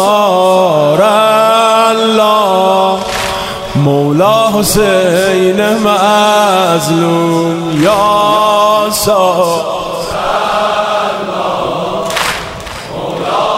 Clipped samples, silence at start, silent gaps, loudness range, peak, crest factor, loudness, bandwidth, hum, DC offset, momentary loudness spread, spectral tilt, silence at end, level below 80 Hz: under 0.1%; 0 s; none; 5 LU; 0 dBFS; 10 dB; -10 LUFS; 16.5 kHz; none; under 0.1%; 8 LU; -4.5 dB/octave; 0 s; -38 dBFS